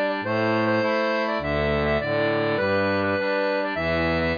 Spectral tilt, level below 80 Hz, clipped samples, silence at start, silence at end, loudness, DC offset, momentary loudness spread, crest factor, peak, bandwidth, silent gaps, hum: -7 dB/octave; -42 dBFS; under 0.1%; 0 s; 0 s; -23 LUFS; under 0.1%; 2 LU; 12 dB; -12 dBFS; 5.2 kHz; none; none